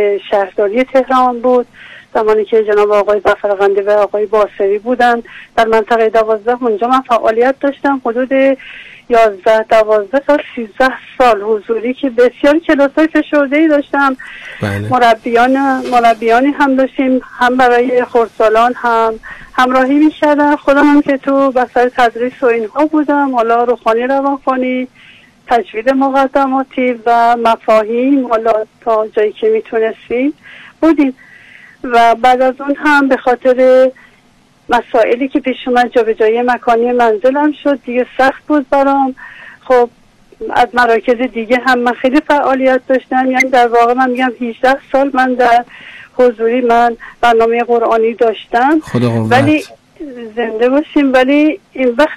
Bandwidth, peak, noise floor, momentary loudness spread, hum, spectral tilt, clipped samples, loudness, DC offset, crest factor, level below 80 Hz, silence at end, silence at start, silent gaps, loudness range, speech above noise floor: 13.5 kHz; -2 dBFS; -49 dBFS; 6 LU; none; -6 dB/octave; under 0.1%; -12 LUFS; under 0.1%; 8 dB; -46 dBFS; 0 s; 0 s; none; 2 LU; 37 dB